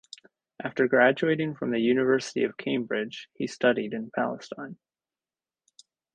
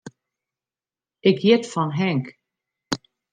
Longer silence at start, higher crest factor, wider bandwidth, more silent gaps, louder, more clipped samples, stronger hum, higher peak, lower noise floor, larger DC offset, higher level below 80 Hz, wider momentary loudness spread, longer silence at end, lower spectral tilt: first, 0.6 s vs 0.05 s; about the same, 20 dB vs 20 dB; about the same, 9.4 kHz vs 9.6 kHz; neither; second, -26 LUFS vs -22 LUFS; neither; neither; second, -8 dBFS vs -4 dBFS; about the same, under -90 dBFS vs under -90 dBFS; neither; about the same, -70 dBFS vs -68 dBFS; first, 17 LU vs 12 LU; first, 1.4 s vs 0.35 s; about the same, -5.5 dB/octave vs -6 dB/octave